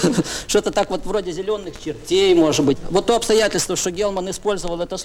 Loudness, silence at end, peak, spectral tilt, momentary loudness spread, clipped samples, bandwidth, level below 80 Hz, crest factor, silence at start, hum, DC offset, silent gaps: -19 LUFS; 0 s; -4 dBFS; -4 dB/octave; 10 LU; under 0.1%; 18 kHz; -38 dBFS; 16 dB; 0 s; none; under 0.1%; none